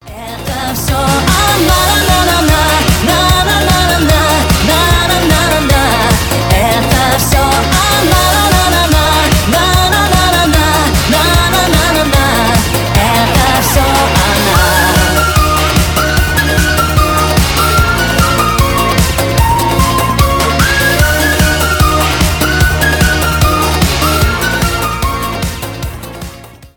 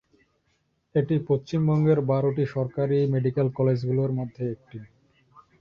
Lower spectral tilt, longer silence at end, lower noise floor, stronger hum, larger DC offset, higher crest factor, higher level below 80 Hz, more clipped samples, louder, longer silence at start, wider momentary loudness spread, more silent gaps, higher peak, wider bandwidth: second, -4 dB/octave vs -10 dB/octave; second, 0.1 s vs 0.75 s; second, -31 dBFS vs -71 dBFS; neither; neither; about the same, 10 dB vs 14 dB; first, -18 dBFS vs -60 dBFS; neither; first, -10 LUFS vs -25 LUFS; second, 0.05 s vs 0.95 s; second, 4 LU vs 11 LU; neither; first, 0 dBFS vs -10 dBFS; first, 19.5 kHz vs 6.8 kHz